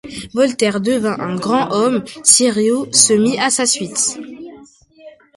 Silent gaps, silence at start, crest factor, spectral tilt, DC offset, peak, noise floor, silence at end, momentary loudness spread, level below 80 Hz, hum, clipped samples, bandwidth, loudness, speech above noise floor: none; 0.05 s; 16 dB; -2.5 dB/octave; under 0.1%; 0 dBFS; -44 dBFS; 0.25 s; 10 LU; -56 dBFS; none; under 0.1%; 16 kHz; -14 LUFS; 28 dB